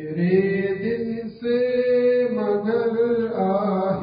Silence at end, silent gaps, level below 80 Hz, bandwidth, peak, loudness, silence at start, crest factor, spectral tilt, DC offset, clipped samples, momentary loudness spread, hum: 0 s; none; -58 dBFS; 5.2 kHz; -8 dBFS; -22 LUFS; 0 s; 14 dB; -12 dB/octave; under 0.1%; under 0.1%; 6 LU; none